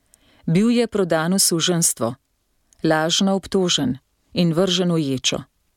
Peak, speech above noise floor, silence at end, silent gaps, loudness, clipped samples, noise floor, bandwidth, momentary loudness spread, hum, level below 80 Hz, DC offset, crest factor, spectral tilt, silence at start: -6 dBFS; 48 dB; 0.35 s; none; -19 LUFS; under 0.1%; -67 dBFS; 17.5 kHz; 10 LU; none; -56 dBFS; under 0.1%; 16 dB; -4 dB/octave; 0.45 s